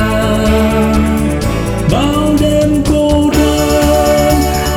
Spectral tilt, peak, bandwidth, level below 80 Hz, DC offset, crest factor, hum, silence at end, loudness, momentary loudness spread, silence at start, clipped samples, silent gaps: -5.5 dB/octave; -2 dBFS; 20 kHz; -20 dBFS; under 0.1%; 10 dB; none; 0 s; -11 LUFS; 4 LU; 0 s; under 0.1%; none